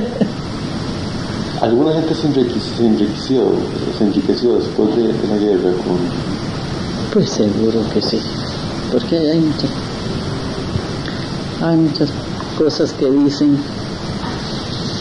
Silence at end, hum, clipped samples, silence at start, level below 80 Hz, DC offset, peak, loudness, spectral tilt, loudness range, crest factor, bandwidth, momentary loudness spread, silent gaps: 0 s; none; under 0.1%; 0 s; -38 dBFS; 0.3%; -2 dBFS; -17 LUFS; -6.5 dB/octave; 3 LU; 16 dB; 11 kHz; 8 LU; none